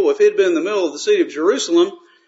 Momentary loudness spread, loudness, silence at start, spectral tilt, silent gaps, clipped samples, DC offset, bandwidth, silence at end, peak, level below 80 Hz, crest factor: 5 LU; -17 LUFS; 0 s; -2.5 dB/octave; none; under 0.1%; under 0.1%; 8 kHz; 0.3 s; -4 dBFS; -78 dBFS; 12 dB